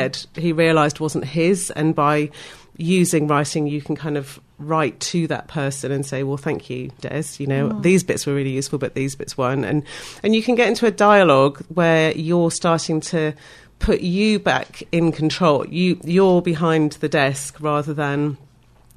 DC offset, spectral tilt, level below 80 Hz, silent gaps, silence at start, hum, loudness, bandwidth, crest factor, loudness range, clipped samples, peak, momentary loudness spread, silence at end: under 0.1%; -5.5 dB/octave; -42 dBFS; none; 0 s; none; -19 LUFS; 14 kHz; 18 dB; 6 LU; under 0.1%; -2 dBFS; 10 LU; 0.6 s